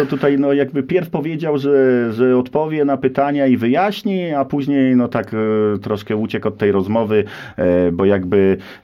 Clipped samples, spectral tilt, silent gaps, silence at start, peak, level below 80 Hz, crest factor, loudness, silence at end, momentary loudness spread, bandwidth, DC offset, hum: under 0.1%; -8.5 dB/octave; none; 0 s; -4 dBFS; -52 dBFS; 14 dB; -17 LUFS; 0.05 s; 6 LU; 13.5 kHz; under 0.1%; none